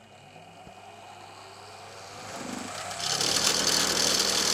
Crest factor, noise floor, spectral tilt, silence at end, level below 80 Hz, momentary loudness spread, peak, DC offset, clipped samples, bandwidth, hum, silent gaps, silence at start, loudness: 22 dB; -50 dBFS; -0.5 dB/octave; 0 s; -60 dBFS; 24 LU; -8 dBFS; under 0.1%; under 0.1%; 17 kHz; none; none; 0.1 s; -24 LUFS